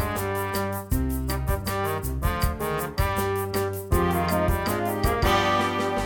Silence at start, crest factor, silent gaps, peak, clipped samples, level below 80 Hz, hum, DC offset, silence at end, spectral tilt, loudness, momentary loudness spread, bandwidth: 0 s; 16 dB; none; -8 dBFS; under 0.1%; -32 dBFS; none; under 0.1%; 0 s; -5.5 dB/octave; -25 LUFS; 6 LU; 19.5 kHz